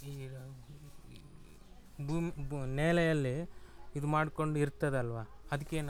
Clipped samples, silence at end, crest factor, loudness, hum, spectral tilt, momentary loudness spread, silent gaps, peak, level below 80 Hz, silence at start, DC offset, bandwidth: under 0.1%; 0 s; 20 dB; -35 LUFS; none; -7 dB/octave; 24 LU; none; -16 dBFS; -52 dBFS; 0 s; under 0.1%; 15 kHz